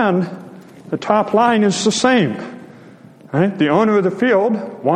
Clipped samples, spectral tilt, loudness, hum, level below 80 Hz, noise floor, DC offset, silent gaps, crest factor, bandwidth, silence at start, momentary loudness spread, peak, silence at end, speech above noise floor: under 0.1%; -5 dB/octave; -16 LUFS; none; -60 dBFS; -41 dBFS; under 0.1%; none; 16 dB; 10 kHz; 0 s; 13 LU; 0 dBFS; 0 s; 26 dB